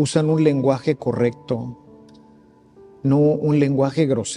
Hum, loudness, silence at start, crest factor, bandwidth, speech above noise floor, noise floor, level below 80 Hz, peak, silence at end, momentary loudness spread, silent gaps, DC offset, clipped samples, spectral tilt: none; -19 LUFS; 0 s; 16 dB; 11 kHz; 32 dB; -51 dBFS; -58 dBFS; -4 dBFS; 0 s; 10 LU; none; under 0.1%; under 0.1%; -7 dB/octave